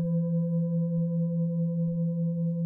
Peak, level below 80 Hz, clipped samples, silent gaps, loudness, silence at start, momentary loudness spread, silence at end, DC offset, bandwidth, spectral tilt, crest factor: -20 dBFS; -66 dBFS; under 0.1%; none; -28 LUFS; 0 s; 1 LU; 0 s; under 0.1%; 1.1 kHz; -15 dB/octave; 6 dB